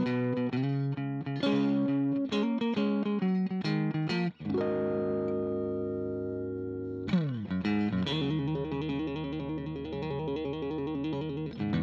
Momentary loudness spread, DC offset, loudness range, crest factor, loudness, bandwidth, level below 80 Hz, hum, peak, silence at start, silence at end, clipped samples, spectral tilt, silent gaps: 6 LU; under 0.1%; 4 LU; 14 dB; -32 LUFS; 7.4 kHz; -56 dBFS; none; -16 dBFS; 0 s; 0 s; under 0.1%; -8 dB/octave; none